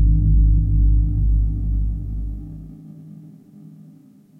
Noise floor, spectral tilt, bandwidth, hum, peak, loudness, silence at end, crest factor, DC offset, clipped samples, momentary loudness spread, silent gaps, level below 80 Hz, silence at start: -48 dBFS; -12.5 dB/octave; 0.8 kHz; none; -6 dBFS; -20 LUFS; 1.1 s; 12 dB; under 0.1%; under 0.1%; 23 LU; none; -20 dBFS; 0 s